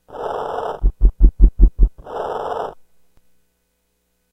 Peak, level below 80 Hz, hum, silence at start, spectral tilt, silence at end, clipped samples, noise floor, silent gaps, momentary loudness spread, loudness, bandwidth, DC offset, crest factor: 0 dBFS; -18 dBFS; none; 0.1 s; -9 dB/octave; 1.6 s; 0.2%; -68 dBFS; none; 11 LU; -21 LUFS; 3.7 kHz; under 0.1%; 18 dB